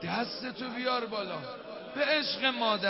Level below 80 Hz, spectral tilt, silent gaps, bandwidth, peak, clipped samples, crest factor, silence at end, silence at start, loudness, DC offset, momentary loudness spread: -72 dBFS; -7 dB/octave; none; 5.8 kHz; -14 dBFS; under 0.1%; 18 dB; 0 s; 0 s; -31 LUFS; under 0.1%; 12 LU